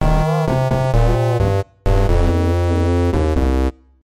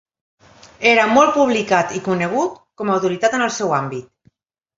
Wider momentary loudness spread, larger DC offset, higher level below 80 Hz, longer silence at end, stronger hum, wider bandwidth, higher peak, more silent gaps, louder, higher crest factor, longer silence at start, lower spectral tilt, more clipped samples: second, 3 LU vs 11 LU; neither; first, -20 dBFS vs -60 dBFS; second, 0.35 s vs 0.75 s; neither; first, 13.5 kHz vs 7.8 kHz; second, -6 dBFS vs 0 dBFS; neither; about the same, -17 LUFS vs -17 LUFS; second, 10 dB vs 18 dB; second, 0 s vs 0.8 s; first, -8 dB/octave vs -4.5 dB/octave; neither